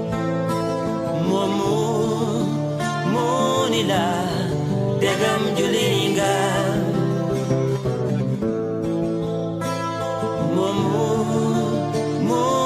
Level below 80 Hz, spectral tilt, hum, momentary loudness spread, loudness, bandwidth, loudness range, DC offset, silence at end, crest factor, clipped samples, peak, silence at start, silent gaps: -50 dBFS; -5.5 dB/octave; none; 5 LU; -21 LUFS; 15.5 kHz; 3 LU; under 0.1%; 0 s; 14 dB; under 0.1%; -8 dBFS; 0 s; none